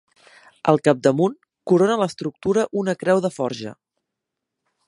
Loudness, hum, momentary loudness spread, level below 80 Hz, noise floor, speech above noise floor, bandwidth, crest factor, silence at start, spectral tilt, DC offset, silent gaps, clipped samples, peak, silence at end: -20 LUFS; none; 10 LU; -62 dBFS; -82 dBFS; 63 dB; 11.5 kHz; 22 dB; 0.65 s; -6.5 dB/octave; under 0.1%; none; under 0.1%; 0 dBFS; 1.15 s